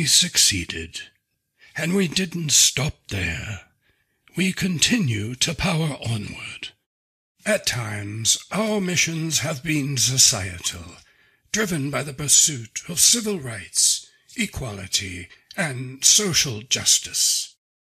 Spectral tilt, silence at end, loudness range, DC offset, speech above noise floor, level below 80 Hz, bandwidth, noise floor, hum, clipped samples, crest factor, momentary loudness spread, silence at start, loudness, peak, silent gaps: -2 dB/octave; 0.4 s; 4 LU; under 0.1%; 45 dB; -48 dBFS; 14.5 kHz; -67 dBFS; none; under 0.1%; 24 dB; 18 LU; 0 s; -20 LUFS; 0 dBFS; 6.86-7.35 s